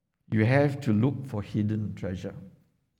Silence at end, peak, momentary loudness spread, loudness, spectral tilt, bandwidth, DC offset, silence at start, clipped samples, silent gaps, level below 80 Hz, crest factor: 0.5 s; -10 dBFS; 13 LU; -28 LUFS; -8.5 dB/octave; 10.5 kHz; under 0.1%; 0.3 s; under 0.1%; none; -60 dBFS; 18 dB